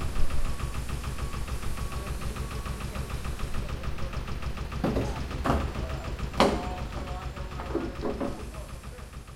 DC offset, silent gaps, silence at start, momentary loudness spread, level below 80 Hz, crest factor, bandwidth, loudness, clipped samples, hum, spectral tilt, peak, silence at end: under 0.1%; none; 0 s; 8 LU; -34 dBFS; 26 dB; 15.5 kHz; -33 LUFS; under 0.1%; none; -5.5 dB/octave; -4 dBFS; 0 s